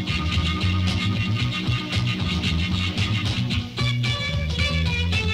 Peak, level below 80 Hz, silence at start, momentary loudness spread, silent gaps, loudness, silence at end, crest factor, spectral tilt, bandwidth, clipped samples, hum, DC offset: -10 dBFS; -34 dBFS; 0 s; 2 LU; none; -23 LUFS; 0 s; 12 dB; -5 dB/octave; 12 kHz; under 0.1%; none; under 0.1%